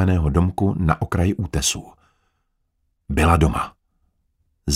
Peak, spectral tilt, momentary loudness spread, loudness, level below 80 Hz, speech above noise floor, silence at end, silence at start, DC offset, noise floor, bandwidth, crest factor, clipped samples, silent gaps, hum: -2 dBFS; -5.5 dB/octave; 11 LU; -20 LUFS; -30 dBFS; 51 dB; 0 s; 0 s; under 0.1%; -70 dBFS; 15.5 kHz; 20 dB; under 0.1%; none; none